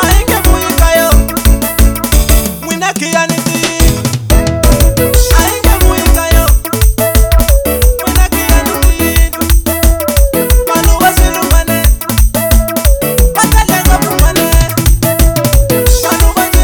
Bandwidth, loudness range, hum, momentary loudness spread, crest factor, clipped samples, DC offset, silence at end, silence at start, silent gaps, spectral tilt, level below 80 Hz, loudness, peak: over 20 kHz; 1 LU; none; 3 LU; 8 dB; 3%; under 0.1%; 0 s; 0 s; none; -4.5 dB/octave; -10 dBFS; -10 LUFS; 0 dBFS